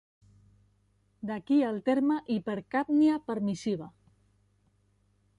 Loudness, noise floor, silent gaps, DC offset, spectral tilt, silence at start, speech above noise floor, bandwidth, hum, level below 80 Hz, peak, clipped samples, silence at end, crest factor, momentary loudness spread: -29 LUFS; -69 dBFS; none; under 0.1%; -7 dB/octave; 1.25 s; 41 dB; 10.5 kHz; 50 Hz at -55 dBFS; -70 dBFS; -16 dBFS; under 0.1%; 1.5 s; 16 dB; 13 LU